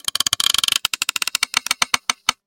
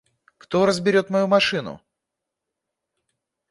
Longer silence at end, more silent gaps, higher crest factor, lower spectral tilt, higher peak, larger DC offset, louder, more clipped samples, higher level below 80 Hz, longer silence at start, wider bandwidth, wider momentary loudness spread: second, 0.15 s vs 1.75 s; neither; about the same, 22 dB vs 20 dB; second, 2 dB/octave vs -5 dB/octave; first, 0 dBFS vs -4 dBFS; neither; about the same, -18 LUFS vs -20 LUFS; neither; first, -54 dBFS vs -62 dBFS; second, 0.05 s vs 0.5 s; first, 17 kHz vs 11.5 kHz; second, 5 LU vs 10 LU